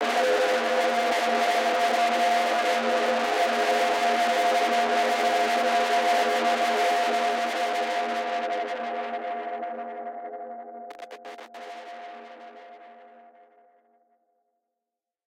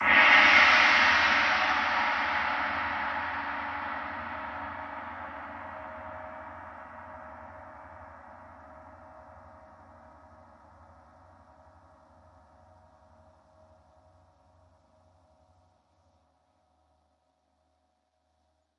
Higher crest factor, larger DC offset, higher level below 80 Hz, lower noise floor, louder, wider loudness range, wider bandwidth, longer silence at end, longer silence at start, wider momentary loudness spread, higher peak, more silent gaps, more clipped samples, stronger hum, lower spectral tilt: second, 14 dB vs 24 dB; neither; second, -76 dBFS vs -62 dBFS; first, -87 dBFS vs -75 dBFS; about the same, -24 LUFS vs -23 LUFS; second, 19 LU vs 28 LU; first, 16.5 kHz vs 8.8 kHz; second, 2.3 s vs 9.4 s; about the same, 0 s vs 0 s; second, 18 LU vs 28 LU; second, -12 dBFS vs -6 dBFS; neither; neither; neither; about the same, -1 dB/octave vs -2 dB/octave